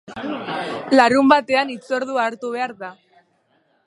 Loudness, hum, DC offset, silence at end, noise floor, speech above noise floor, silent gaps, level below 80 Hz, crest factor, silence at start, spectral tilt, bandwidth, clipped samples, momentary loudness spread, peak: -19 LUFS; none; under 0.1%; 0.95 s; -63 dBFS; 44 dB; none; -64 dBFS; 20 dB; 0.1 s; -4.5 dB/octave; 11.5 kHz; under 0.1%; 15 LU; 0 dBFS